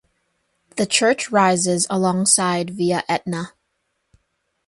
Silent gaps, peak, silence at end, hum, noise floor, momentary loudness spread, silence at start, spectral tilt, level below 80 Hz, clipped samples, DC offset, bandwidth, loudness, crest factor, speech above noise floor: none; 0 dBFS; 1.2 s; none; -72 dBFS; 12 LU; 0.75 s; -3.5 dB/octave; -62 dBFS; under 0.1%; under 0.1%; 11.5 kHz; -18 LUFS; 22 dB; 53 dB